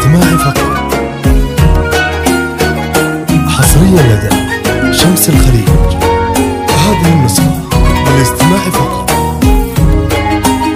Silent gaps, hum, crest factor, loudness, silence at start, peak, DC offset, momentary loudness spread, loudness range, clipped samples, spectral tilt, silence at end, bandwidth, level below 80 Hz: none; none; 8 dB; -9 LUFS; 0 s; 0 dBFS; under 0.1%; 5 LU; 2 LU; 0.7%; -5 dB/octave; 0 s; 16.5 kHz; -16 dBFS